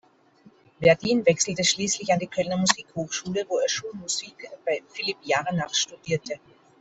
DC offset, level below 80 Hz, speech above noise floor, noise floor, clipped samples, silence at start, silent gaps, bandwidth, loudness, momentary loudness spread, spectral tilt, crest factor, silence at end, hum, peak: under 0.1%; -62 dBFS; 31 dB; -56 dBFS; under 0.1%; 0.8 s; none; 8.4 kHz; -25 LUFS; 9 LU; -3 dB/octave; 24 dB; 0.45 s; none; -2 dBFS